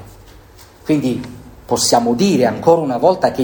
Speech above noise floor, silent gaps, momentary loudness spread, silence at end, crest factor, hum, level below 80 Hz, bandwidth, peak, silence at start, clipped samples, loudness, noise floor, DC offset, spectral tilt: 28 dB; none; 11 LU; 0 s; 16 dB; none; -46 dBFS; over 20 kHz; 0 dBFS; 0 s; under 0.1%; -15 LUFS; -42 dBFS; under 0.1%; -4.5 dB/octave